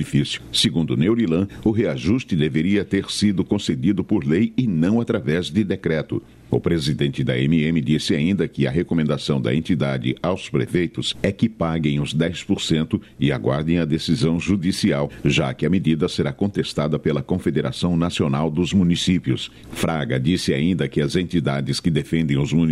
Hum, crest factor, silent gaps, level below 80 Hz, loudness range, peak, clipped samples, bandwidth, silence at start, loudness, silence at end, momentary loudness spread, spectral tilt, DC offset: none; 14 dB; none; -44 dBFS; 1 LU; -6 dBFS; under 0.1%; 13 kHz; 0 s; -21 LUFS; 0 s; 4 LU; -6 dB/octave; under 0.1%